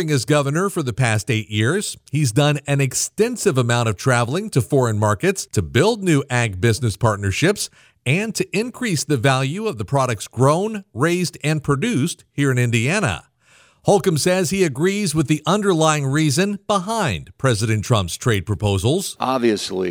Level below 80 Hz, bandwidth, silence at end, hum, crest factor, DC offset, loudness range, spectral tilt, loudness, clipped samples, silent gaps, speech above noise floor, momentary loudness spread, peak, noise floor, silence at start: -48 dBFS; 19.5 kHz; 0 s; none; 16 dB; under 0.1%; 2 LU; -5 dB/octave; -19 LUFS; under 0.1%; none; 35 dB; 5 LU; -4 dBFS; -54 dBFS; 0 s